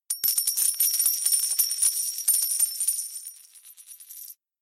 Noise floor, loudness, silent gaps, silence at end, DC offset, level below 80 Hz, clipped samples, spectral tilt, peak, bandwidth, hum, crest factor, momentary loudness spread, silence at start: -50 dBFS; -22 LUFS; none; 0.3 s; under 0.1%; under -90 dBFS; under 0.1%; 6 dB/octave; -10 dBFS; 17.5 kHz; none; 18 dB; 20 LU; 0.1 s